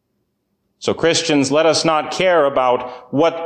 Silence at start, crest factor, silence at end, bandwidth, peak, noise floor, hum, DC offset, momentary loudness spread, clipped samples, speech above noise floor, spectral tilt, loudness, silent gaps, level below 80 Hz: 0.8 s; 14 dB; 0 s; 10 kHz; -4 dBFS; -70 dBFS; none; under 0.1%; 8 LU; under 0.1%; 54 dB; -3.5 dB/octave; -16 LUFS; none; -58 dBFS